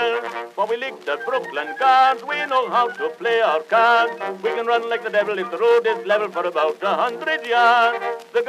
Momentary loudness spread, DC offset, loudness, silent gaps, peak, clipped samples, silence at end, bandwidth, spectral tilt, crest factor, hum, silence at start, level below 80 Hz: 10 LU; under 0.1%; -20 LUFS; none; -2 dBFS; under 0.1%; 0 s; 13.5 kHz; -3.5 dB/octave; 16 dB; none; 0 s; under -90 dBFS